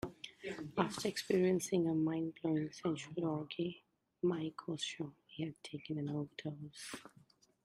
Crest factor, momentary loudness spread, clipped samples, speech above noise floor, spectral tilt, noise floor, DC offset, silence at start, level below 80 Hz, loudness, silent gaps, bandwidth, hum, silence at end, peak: 24 dB; 14 LU; under 0.1%; 30 dB; -5.5 dB/octave; -68 dBFS; under 0.1%; 0.05 s; -74 dBFS; -39 LUFS; none; 14.5 kHz; none; 0.55 s; -16 dBFS